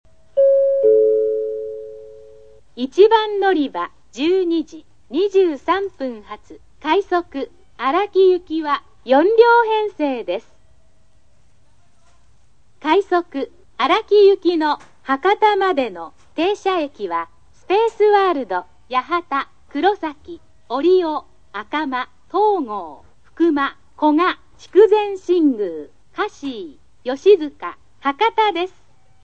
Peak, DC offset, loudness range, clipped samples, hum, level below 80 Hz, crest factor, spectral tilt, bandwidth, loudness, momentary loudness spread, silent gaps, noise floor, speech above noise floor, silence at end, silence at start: 0 dBFS; 0.5%; 5 LU; under 0.1%; none; -58 dBFS; 18 dB; -4.5 dB/octave; 7.8 kHz; -18 LUFS; 17 LU; none; -58 dBFS; 41 dB; 0.55 s; 0.35 s